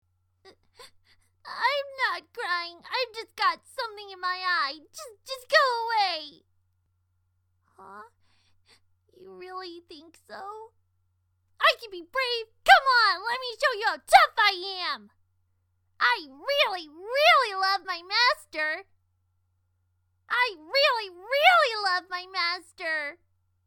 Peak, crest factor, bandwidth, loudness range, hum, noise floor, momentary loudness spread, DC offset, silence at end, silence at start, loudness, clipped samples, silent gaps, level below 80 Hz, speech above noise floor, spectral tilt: -2 dBFS; 26 dB; 18 kHz; 10 LU; none; -72 dBFS; 20 LU; under 0.1%; 0.55 s; 0.8 s; -24 LUFS; under 0.1%; none; -68 dBFS; 46 dB; 0 dB/octave